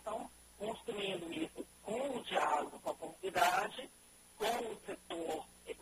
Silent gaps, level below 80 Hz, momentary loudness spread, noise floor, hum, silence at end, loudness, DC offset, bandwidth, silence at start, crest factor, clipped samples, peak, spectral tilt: none; -70 dBFS; 16 LU; -62 dBFS; none; 0 s; -39 LUFS; under 0.1%; 15 kHz; 0 s; 22 dB; under 0.1%; -18 dBFS; -3 dB/octave